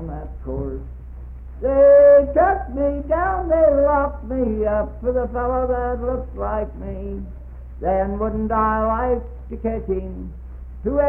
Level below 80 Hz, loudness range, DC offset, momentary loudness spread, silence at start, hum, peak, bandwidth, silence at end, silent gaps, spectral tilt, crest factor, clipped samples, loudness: -32 dBFS; 8 LU; under 0.1%; 21 LU; 0 s; none; -4 dBFS; 3 kHz; 0 s; none; -11.5 dB/octave; 16 dB; under 0.1%; -19 LUFS